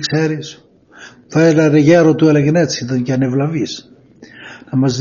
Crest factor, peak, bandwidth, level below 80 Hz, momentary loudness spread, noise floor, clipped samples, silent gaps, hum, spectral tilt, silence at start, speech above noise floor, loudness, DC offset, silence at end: 14 dB; 0 dBFS; 7.2 kHz; -54 dBFS; 17 LU; -40 dBFS; under 0.1%; none; none; -6.5 dB/octave; 0 s; 27 dB; -14 LUFS; under 0.1%; 0 s